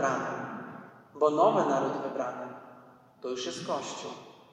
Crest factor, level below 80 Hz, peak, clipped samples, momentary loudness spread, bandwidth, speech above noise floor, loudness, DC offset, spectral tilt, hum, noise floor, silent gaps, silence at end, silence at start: 20 dB; -80 dBFS; -12 dBFS; under 0.1%; 21 LU; 10.5 kHz; 26 dB; -30 LUFS; under 0.1%; -4.5 dB/octave; none; -55 dBFS; none; 0.15 s; 0 s